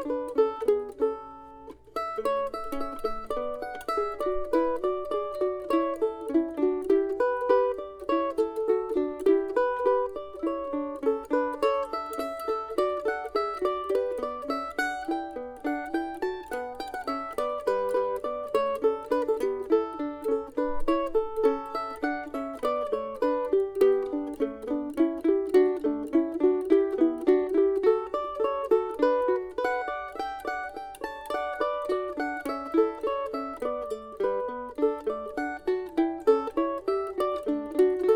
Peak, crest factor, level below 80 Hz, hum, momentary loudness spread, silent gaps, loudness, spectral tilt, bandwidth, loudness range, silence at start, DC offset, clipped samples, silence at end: -8 dBFS; 18 dB; -52 dBFS; none; 9 LU; none; -28 LUFS; -5 dB/octave; 17 kHz; 6 LU; 0 s; under 0.1%; under 0.1%; 0 s